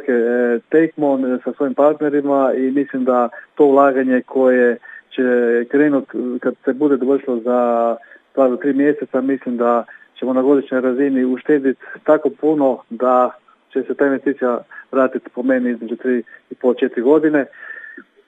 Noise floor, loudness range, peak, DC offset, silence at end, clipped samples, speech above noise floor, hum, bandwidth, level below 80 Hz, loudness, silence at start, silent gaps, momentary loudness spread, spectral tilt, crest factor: -38 dBFS; 3 LU; 0 dBFS; under 0.1%; 0.25 s; under 0.1%; 22 dB; none; 3.9 kHz; -80 dBFS; -17 LUFS; 0 s; none; 9 LU; -8.5 dB/octave; 16 dB